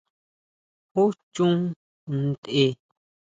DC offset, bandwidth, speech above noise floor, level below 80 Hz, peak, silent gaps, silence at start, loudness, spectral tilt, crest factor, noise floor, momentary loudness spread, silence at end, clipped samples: under 0.1%; 8.8 kHz; over 67 dB; -68 dBFS; -10 dBFS; 1.23-1.32 s, 1.76-2.07 s, 2.38-2.43 s; 0.95 s; -25 LUFS; -7 dB/octave; 18 dB; under -90 dBFS; 9 LU; 0.5 s; under 0.1%